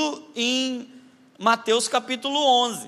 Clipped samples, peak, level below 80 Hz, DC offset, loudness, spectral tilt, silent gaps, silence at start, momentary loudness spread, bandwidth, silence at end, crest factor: under 0.1%; -4 dBFS; -86 dBFS; under 0.1%; -22 LUFS; -1.5 dB/octave; none; 0 s; 8 LU; 15 kHz; 0 s; 20 dB